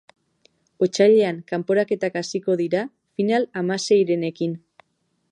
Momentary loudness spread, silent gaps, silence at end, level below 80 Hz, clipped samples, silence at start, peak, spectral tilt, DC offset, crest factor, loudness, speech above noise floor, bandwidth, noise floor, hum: 12 LU; none; 0.75 s; -74 dBFS; under 0.1%; 0.8 s; -4 dBFS; -5.5 dB/octave; under 0.1%; 18 dB; -21 LUFS; 50 dB; 10.5 kHz; -71 dBFS; none